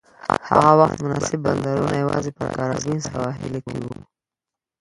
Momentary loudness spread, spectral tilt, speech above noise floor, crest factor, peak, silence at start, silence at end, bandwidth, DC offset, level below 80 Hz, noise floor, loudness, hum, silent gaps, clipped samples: 15 LU; -6 dB/octave; 68 dB; 22 dB; 0 dBFS; 0.25 s; 0.9 s; 11.5 kHz; under 0.1%; -50 dBFS; -88 dBFS; -21 LUFS; none; none; under 0.1%